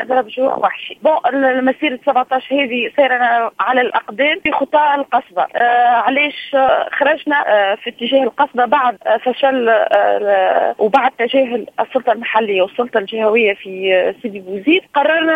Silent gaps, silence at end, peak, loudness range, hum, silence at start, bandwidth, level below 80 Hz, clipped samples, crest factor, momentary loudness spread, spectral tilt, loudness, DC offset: none; 0 s; 0 dBFS; 2 LU; none; 0 s; 5 kHz; -62 dBFS; under 0.1%; 14 dB; 5 LU; -5.5 dB/octave; -15 LUFS; under 0.1%